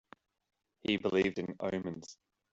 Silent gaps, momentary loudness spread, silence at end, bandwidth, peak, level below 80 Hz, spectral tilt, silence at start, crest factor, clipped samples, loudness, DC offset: none; 14 LU; 0.4 s; 7.8 kHz; -16 dBFS; -68 dBFS; -5.5 dB/octave; 0.85 s; 20 dB; under 0.1%; -34 LUFS; under 0.1%